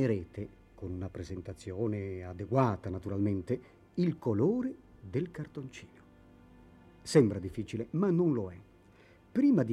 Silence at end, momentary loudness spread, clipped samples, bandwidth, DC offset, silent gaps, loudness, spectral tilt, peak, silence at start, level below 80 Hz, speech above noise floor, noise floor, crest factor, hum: 0 s; 17 LU; under 0.1%; 12 kHz; under 0.1%; none; -33 LUFS; -8 dB/octave; -12 dBFS; 0 s; -60 dBFS; 28 dB; -60 dBFS; 20 dB; none